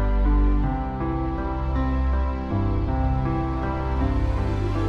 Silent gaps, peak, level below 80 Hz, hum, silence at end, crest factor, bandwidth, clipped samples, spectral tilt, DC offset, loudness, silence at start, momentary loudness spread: none; -10 dBFS; -24 dBFS; none; 0 s; 12 dB; 5.8 kHz; under 0.1%; -9.5 dB/octave; under 0.1%; -25 LUFS; 0 s; 4 LU